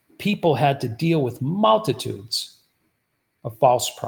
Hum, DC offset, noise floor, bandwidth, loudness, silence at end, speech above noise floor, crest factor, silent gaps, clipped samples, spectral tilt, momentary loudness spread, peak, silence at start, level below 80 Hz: none; under 0.1%; -73 dBFS; over 20 kHz; -21 LUFS; 0 s; 52 dB; 18 dB; none; under 0.1%; -5.5 dB/octave; 10 LU; -4 dBFS; 0.2 s; -62 dBFS